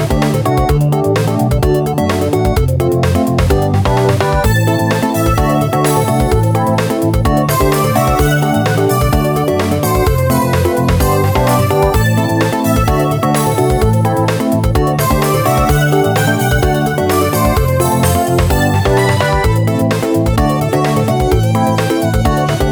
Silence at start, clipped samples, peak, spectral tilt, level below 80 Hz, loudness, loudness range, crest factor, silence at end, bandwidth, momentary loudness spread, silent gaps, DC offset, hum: 0 s; under 0.1%; 0 dBFS; -6 dB/octave; -22 dBFS; -13 LUFS; 1 LU; 12 dB; 0 s; over 20 kHz; 2 LU; none; under 0.1%; none